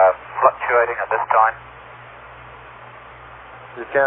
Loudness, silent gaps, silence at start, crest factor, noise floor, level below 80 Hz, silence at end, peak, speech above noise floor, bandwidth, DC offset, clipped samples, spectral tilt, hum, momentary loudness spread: -18 LUFS; none; 0 s; 20 dB; -40 dBFS; -54 dBFS; 0 s; -2 dBFS; 22 dB; 3.8 kHz; under 0.1%; under 0.1%; -9 dB/octave; none; 23 LU